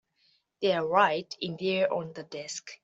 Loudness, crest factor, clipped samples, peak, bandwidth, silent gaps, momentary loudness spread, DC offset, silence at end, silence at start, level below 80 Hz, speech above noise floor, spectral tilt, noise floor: -28 LUFS; 20 dB; under 0.1%; -8 dBFS; 8.2 kHz; none; 14 LU; under 0.1%; 0.1 s; 0.6 s; -76 dBFS; 41 dB; -4 dB/octave; -70 dBFS